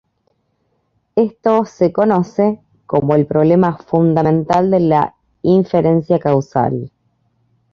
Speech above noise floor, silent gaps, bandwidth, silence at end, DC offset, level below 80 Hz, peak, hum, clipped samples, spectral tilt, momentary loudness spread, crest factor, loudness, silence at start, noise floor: 51 dB; none; 7.2 kHz; 0.85 s; under 0.1%; -50 dBFS; 0 dBFS; none; under 0.1%; -9.5 dB/octave; 7 LU; 16 dB; -15 LUFS; 1.15 s; -65 dBFS